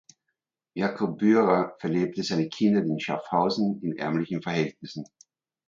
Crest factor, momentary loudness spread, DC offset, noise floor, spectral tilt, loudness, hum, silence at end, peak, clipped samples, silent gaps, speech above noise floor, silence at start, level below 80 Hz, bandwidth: 20 dB; 13 LU; under 0.1%; -82 dBFS; -6.5 dB/octave; -26 LUFS; none; 0.65 s; -6 dBFS; under 0.1%; none; 57 dB; 0.75 s; -68 dBFS; 7.6 kHz